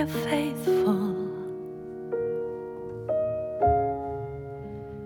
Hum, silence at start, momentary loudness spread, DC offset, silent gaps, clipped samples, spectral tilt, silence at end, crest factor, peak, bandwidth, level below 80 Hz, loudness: none; 0 s; 14 LU; under 0.1%; none; under 0.1%; -7 dB/octave; 0 s; 16 dB; -12 dBFS; 19 kHz; -48 dBFS; -29 LUFS